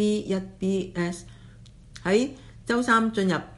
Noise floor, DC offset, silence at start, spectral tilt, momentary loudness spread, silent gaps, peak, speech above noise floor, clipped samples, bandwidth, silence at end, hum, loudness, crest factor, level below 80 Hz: -48 dBFS; under 0.1%; 0 s; -5.5 dB/octave; 11 LU; none; -8 dBFS; 23 dB; under 0.1%; 11.5 kHz; 0 s; none; -26 LUFS; 20 dB; -52 dBFS